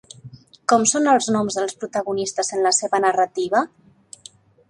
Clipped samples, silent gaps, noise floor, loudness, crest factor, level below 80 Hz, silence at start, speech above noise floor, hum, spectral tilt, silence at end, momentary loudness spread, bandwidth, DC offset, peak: under 0.1%; none; -48 dBFS; -20 LUFS; 18 dB; -64 dBFS; 0.25 s; 28 dB; none; -2.5 dB/octave; 1.05 s; 9 LU; 11.5 kHz; under 0.1%; -2 dBFS